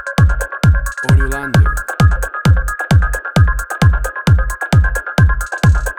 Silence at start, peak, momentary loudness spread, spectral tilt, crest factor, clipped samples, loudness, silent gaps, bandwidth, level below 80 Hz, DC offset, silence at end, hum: 0 s; 0 dBFS; 2 LU; -6 dB/octave; 12 dB; under 0.1%; -14 LUFS; none; 17.5 kHz; -18 dBFS; under 0.1%; 0.05 s; none